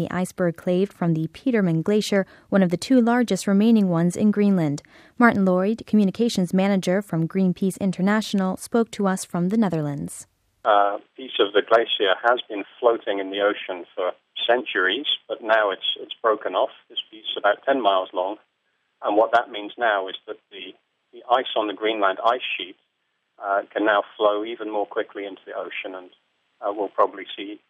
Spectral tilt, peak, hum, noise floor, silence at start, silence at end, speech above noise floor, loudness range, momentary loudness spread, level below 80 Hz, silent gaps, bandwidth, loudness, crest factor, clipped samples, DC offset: -5.5 dB/octave; -2 dBFS; none; -73 dBFS; 0 s; 0.1 s; 51 dB; 5 LU; 13 LU; -66 dBFS; none; 14.5 kHz; -22 LUFS; 20 dB; under 0.1%; under 0.1%